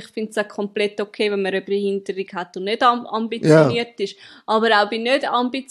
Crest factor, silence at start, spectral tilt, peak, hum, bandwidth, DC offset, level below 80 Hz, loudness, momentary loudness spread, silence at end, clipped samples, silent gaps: 18 dB; 0 s; -5.5 dB/octave; -2 dBFS; none; 12 kHz; under 0.1%; -70 dBFS; -20 LUFS; 13 LU; 0.05 s; under 0.1%; none